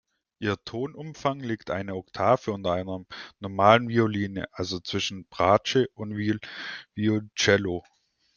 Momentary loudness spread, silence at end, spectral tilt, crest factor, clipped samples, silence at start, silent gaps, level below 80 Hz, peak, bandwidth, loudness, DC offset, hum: 14 LU; 0.55 s; -5 dB/octave; 24 dB; under 0.1%; 0.4 s; none; -62 dBFS; -2 dBFS; 7.2 kHz; -26 LUFS; under 0.1%; none